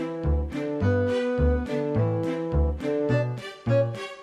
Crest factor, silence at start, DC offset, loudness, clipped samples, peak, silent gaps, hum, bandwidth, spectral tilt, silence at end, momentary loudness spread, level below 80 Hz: 14 dB; 0 s; under 0.1%; -26 LUFS; under 0.1%; -12 dBFS; none; none; 9.8 kHz; -8.5 dB/octave; 0 s; 4 LU; -32 dBFS